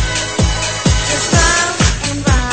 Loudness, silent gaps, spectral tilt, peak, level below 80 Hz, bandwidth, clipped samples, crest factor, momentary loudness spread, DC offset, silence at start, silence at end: -14 LUFS; none; -3.5 dB/octave; 0 dBFS; -20 dBFS; 9.2 kHz; under 0.1%; 14 dB; 5 LU; 0.7%; 0 s; 0 s